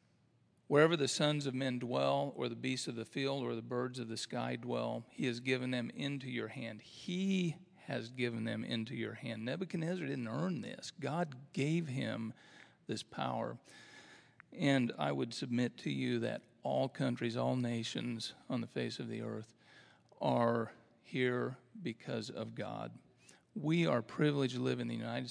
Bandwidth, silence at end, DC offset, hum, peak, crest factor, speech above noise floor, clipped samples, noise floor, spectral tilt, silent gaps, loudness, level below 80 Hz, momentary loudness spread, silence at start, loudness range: 10.5 kHz; 0 s; under 0.1%; none; -14 dBFS; 24 dB; 35 dB; under 0.1%; -72 dBFS; -5.5 dB/octave; none; -38 LUFS; -86 dBFS; 11 LU; 0.7 s; 4 LU